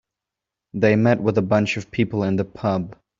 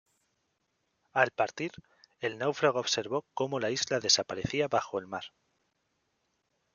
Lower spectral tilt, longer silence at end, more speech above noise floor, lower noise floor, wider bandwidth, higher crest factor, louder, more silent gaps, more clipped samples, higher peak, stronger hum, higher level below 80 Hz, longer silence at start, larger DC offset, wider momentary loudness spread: first, -6.5 dB/octave vs -2.5 dB/octave; second, 0.25 s vs 1.45 s; first, 66 dB vs 48 dB; first, -86 dBFS vs -78 dBFS; second, 7.6 kHz vs 10 kHz; second, 18 dB vs 26 dB; first, -21 LUFS vs -30 LUFS; neither; neither; first, -4 dBFS vs -8 dBFS; neither; first, -56 dBFS vs -68 dBFS; second, 0.75 s vs 1.15 s; neither; second, 7 LU vs 12 LU